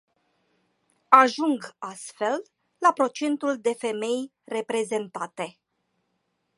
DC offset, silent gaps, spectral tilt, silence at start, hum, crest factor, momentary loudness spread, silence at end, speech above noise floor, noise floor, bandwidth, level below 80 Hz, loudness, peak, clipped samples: under 0.1%; none; -3.5 dB/octave; 1.1 s; none; 26 dB; 18 LU; 1.1 s; 50 dB; -75 dBFS; 11.5 kHz; -82 dBFS; -24 LUFS; 0 dBFS; under 0.1%